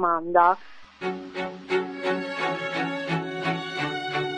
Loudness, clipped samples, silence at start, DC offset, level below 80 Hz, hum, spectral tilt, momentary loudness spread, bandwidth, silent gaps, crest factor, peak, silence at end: -26 LUFS; under 0.1%; 0 s; under 0.1%; -66 dBFS; none; -5.5 dB/octave; 13 LU; 10 kHz; none; 22 dB; -6 dBFS; 0 s